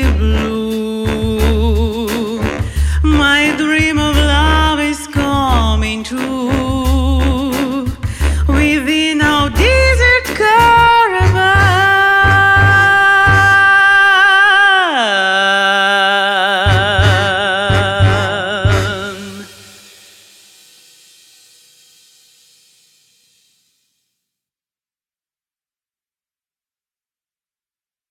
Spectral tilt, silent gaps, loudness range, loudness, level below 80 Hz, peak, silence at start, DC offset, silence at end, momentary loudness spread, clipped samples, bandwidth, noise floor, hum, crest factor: -5 dB/octave; none; 8 LU; -11 LUFS; -22 dBFS; -2 dBFS; 0 s; under 0.1%; 8.65 s; 11 LU; under 0.1%; 16 kHz; under -90 dBFS; none; 12 dB